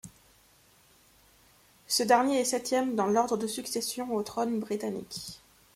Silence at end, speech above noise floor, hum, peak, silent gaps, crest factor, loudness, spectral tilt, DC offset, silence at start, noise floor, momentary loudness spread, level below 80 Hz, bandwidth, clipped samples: 0.4 s; 33 dB; none; -10 dBFS; none; 22 dB; -29 LUFS; -3 dB/octave; under 0.1%; 0.05 s; -62 dBFS; 16 LU; -68 dBFS; 16.5 kHz; under 0.1%